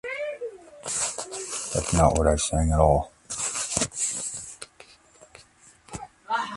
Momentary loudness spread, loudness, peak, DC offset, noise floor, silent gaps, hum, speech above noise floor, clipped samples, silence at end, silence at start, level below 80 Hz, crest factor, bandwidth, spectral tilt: 20 LU; -25 LUFS; -2 dBFS; under 0.1%; -55 dBFS; none; none; 33 dB; under 0.1%; 0 s; 0.05 s; -36 dBFS; 24 dB; 11.5 kHz; -4 dB/octave